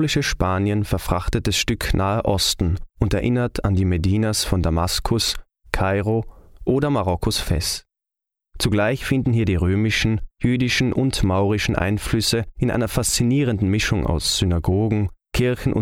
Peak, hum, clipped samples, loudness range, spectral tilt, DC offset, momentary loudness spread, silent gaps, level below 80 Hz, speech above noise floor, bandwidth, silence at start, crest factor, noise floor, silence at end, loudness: 0 dBFS; none; under 0.1%; 2 LU; -5 dB/octave; under 0.1%; 4 LU; none; -32 dBFS; 66 dB; 16.5 kHz; 0 s; 20 dB; -86 dBFS; 0 s; -21 LUFS